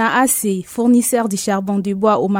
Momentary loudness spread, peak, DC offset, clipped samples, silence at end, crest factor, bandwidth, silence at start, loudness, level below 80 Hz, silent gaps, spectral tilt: 5 LU; -2 dBFS; under 0.1%; under 0.1%; 0 s; 14 dB; 18.5 kHz; 0 s; -16 LUFS; -56 dBFS; none; -4.5 dB/octave